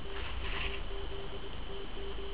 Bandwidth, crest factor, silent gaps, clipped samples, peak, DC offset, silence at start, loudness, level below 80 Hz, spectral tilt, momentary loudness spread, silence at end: 4 kHz; 14 dB; none; under 0.1%; -24 dBFS; 1%; 0 s; -41 LUFS; -42 dBFS; -2.5 dB/octave; 7 LU; 0 s